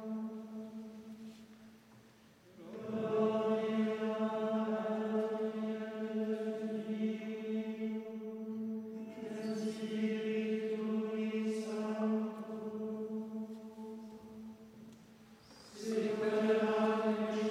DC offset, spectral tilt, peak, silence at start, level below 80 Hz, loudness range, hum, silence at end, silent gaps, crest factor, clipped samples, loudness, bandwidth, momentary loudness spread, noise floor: under 0.1%; -6.5 dB/octave; -20 dBFS; 0 s; -82 dBFS; 7 LU; none; 0 s; none; 16 dB; under 0.1%; -37 LUFS; 11 kHz; 18 LU; -62 dBFS